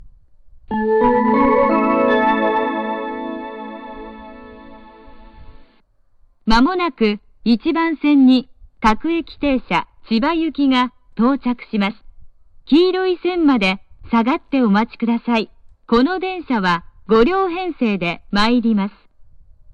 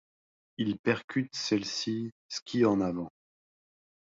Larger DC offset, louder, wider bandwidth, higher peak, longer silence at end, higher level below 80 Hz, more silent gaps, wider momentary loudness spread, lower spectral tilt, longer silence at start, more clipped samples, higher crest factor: neither; first, -17 LUFS vs -31 LUFS; first, 8.6 kHz vs 7.8 kHz; first, -2 dBFS vs -12 dBFS; second, 0.5 s vs 0.95 s; first, -40 dBFS vs -66 dBFS; second, none vs 0.79-0.84 s, 1.04-1.08 s, 2.12-2.29 s, 2.42-2.46 s; about the same, 12 LU vs 12 LU; first, -6.5 dB/octave vs -5 dB/octave; second, 0 s vs 0.6 s; neither; about the same, 16 dB vs 20 dB